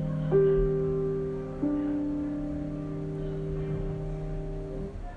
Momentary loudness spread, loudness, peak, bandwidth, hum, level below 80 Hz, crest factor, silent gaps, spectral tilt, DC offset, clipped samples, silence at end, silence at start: 12 LU; -30 LUFS; -12 dBFS; 6 kHz; none; -40 dBFS; 16 dB; none; -10 dB/octave; under 0.1%; under 0.1%; 0 s; 0 s